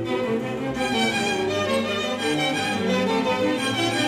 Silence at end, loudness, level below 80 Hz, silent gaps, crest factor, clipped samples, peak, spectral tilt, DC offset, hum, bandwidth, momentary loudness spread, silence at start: 0 s; -23 LUFS; -54 dBFS; none; 12 dB; under 0.1%; -10 dBFS; -4 dB/octave; under 0.1%; none; 16 kHz; 4 LU; 0 s